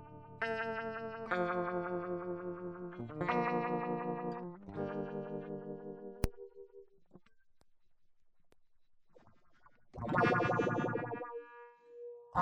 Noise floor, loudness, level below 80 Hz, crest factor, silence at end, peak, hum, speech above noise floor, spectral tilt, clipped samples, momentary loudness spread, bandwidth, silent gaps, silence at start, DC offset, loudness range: -64 dBFS; -38 LUFS; -58 dBFS; 24 dB; 0 s; -16 dBFS; none; 26 dB; -7 dB/octave; under 0.1%; 19 LU; 10.5 kHz; none; 0 s; under 0.1%; 12 LU